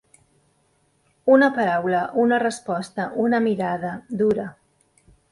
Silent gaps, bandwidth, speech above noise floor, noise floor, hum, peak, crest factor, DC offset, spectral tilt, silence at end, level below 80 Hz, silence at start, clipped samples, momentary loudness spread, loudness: none; 11.5 kHz; 44 dB; -65 dBFS; none; -4 dBFS; 18 dB; under 0.1%; -6 dB/octave; 0.8 s; -64 dBFS; 1.25 s; under 0.1%; 12 LU; -21 LUFS